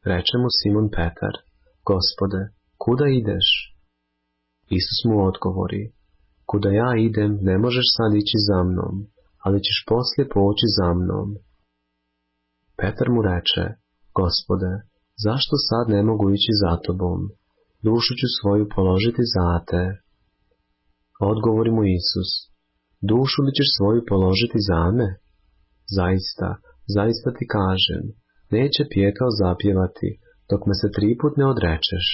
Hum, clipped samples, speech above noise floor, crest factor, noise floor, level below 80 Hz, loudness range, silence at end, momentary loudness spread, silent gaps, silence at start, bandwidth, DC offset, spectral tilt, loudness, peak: none; under 0.1%; 54 dB; 16 dB; -74 dBFS; -36 dBFS; 4 LU; 0 s; 11 LU; none; 0.05 s; 5.8 kHz; under 0.1%; -9.5 dB/octave; -21 LUFS; -6 dBFS